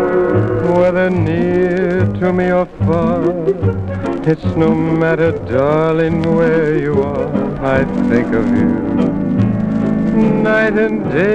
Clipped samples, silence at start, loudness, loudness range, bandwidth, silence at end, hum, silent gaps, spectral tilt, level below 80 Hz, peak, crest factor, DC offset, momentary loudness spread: under 0.1%; 0 s; -15 LUFS; 1 LU; 8.6 kHz; 0 s; none; none; -9 dB/octave; -36 dBFS; 0 dBFS; 14 dB; under 0.1%; 4 LU